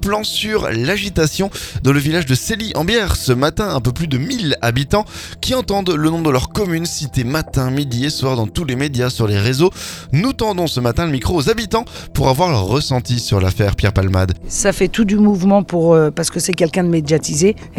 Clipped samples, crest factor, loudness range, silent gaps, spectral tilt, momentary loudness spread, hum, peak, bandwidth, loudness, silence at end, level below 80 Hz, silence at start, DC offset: under 0.1%; 16 dB; 3 LU; none; -5 dB/octave; 5 LU; none; 0 dBFS; 19 kHz; -16 LUFS; 0 s; -32 dBFS; 0 s; under 0.1%